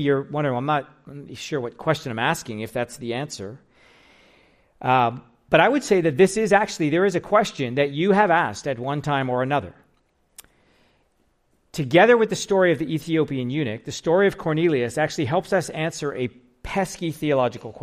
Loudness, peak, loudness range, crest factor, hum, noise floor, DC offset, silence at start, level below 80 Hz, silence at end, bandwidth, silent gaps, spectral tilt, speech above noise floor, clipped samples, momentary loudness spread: -22 LUFS; -2 dBFS; 8 LU; 20 dB; none; -65 dBFS; under 0.1%; 0 s; -56 dBFS; 0 s; 15 kHz; none; -5.5 dB/octave; 44 dB; under 0.1%; 12 LU